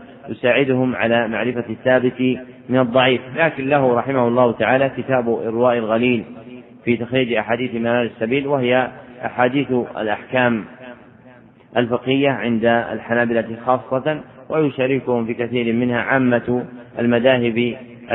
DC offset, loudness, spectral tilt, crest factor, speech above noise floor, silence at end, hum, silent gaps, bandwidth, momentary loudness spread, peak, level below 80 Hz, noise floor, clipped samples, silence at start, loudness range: under 0.1%; -19 LUFS; -11 dB/octave; 18 dB; 28 dB; 0 s; none; none; 4 kHz; 8 LU; 0 dBFS; -56 dBFS; -46 dBFS; under 0.1%; 0 s; 3 LU